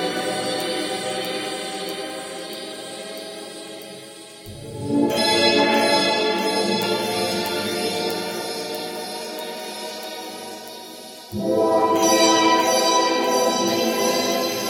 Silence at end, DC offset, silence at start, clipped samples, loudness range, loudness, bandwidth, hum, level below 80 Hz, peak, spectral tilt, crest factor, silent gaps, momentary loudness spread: 0 s; under 0.1%; 0 s; under 0.1%; 12 LU; -21 LUFS; 17 kHz; none; -62 dBFS; -4 dBFS; -2.5 dB/octave; 18 dB; none; 18 LU